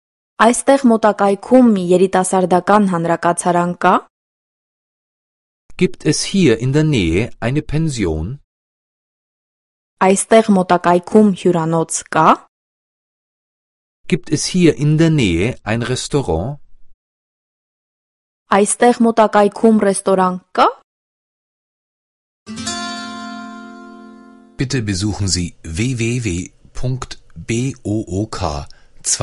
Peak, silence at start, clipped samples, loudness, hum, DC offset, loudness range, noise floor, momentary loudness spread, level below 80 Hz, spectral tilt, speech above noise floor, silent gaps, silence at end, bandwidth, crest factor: 0 dBFS; 0.4 s; under 0.1%; -15 LUFS; none; under 0.1%; 8 LU; -42 dBFS; 14 LU; -38 dBFS; -5.5 dB/octave; 27 dB; 4.10-5.69 s, 8.44-9.97 s, 12.48-14.04 s, 16.94-18.46 s, 20.84-22.46 s; 0 s; 11.5 kHz; 16 dB